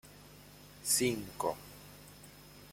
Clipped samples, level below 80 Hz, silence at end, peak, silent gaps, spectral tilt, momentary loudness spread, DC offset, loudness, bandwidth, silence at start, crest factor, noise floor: under 0.1%; -64 dBFS; 0 s; -18 dBFS; none; -2.5 dB/octave; 25 LU; under 0.1%; -33 LUFS; 16.5 kHz; 0.05 s; 22 dB; -55 dBFS